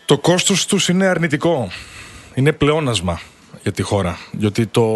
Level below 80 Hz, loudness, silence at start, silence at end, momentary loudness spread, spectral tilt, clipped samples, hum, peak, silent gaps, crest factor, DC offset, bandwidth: -44 dBFS; -17 LUFS; 0.1 s; 0 s; 13 LU; -4.5 dB/octave; under 0.1%; none; 0 dBFS; none; 18 dB; under 0.1%; 12.5 kHz